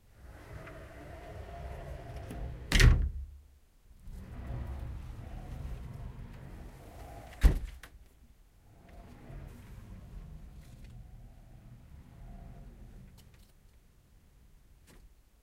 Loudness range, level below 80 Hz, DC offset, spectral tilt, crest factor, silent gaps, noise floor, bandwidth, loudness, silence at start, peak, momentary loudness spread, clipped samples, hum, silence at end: 22 LU; -38 dBFS; under 0.1%; -5 dB/octave; 26 dB; none; -61 dBFS; 15 kHz; -35 LUFS; 0.2 s; -10 dBFS; 25 LU; under 0.1%; none; 0.35 s